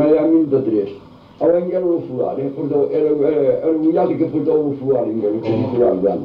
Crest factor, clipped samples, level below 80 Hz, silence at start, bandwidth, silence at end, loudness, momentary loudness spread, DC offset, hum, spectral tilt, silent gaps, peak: 14 dB; under 0.1%; -54 dBFS; 0 s; 5.2 kHz; 0 s; -17 LUFS; 5 LU; under 0.1%; none; -11 dB/octave; none; -4 dBFS